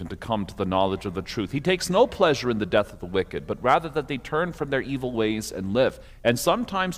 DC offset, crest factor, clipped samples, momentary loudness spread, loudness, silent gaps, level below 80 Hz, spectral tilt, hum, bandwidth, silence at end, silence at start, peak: under 0.1%; 20 dB; under 0.1%; 8 LU; -25 LUFS; none; -48 dBFS; -5 dB/octave; none; 16 kHz; 0 s; 0 s; -6 dBFS